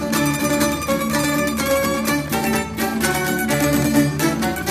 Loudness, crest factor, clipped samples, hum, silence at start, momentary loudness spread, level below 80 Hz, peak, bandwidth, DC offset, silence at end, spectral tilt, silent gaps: -19 LUFS; 16 dB; under 0.1%; none; 0 s; 3 LU; -40 dBFS; -4 dBFS; 15.5 kHz; under 0.1%; 0 s; -4 dB/octave; none